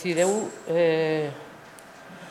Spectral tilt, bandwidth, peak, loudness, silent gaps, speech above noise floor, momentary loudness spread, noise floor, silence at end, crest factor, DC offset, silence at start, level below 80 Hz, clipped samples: -4.5 dB/octave; 14.5 kHz; -10 dBFS; -25 LUFS; none; 22 dB; 23 LU; -46 dBFS; 0 s; 16 dB; under 0.1%; 0 s; -72 dBFS; under 0.1%